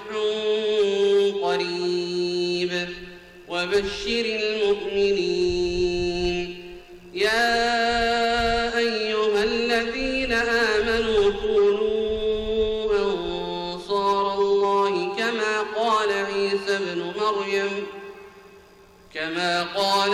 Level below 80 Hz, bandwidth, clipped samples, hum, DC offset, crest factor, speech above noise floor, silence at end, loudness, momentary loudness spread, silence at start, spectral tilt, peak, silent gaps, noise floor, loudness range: -44 dBFS; 13 kHz; under 0.1%; none; under 0.1%; 12 dB; 28 dB; 0 s; -23 LUFS; 8 LU; 0 s; -4 dB/octave; -12 dBFS; none; -51 dBFS; 4 LU